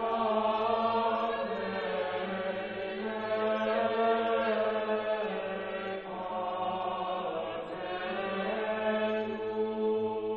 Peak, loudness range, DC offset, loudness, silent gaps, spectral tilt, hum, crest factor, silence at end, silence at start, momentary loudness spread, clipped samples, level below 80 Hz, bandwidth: -18 dBFS; 4 LU; under 0.1%; -32 LUFS; none; -3 dB/octave; none; 14 dB; 0 s; 0 s; 7 LU; under 0.1%; -64 dBFS; 5.6 kHz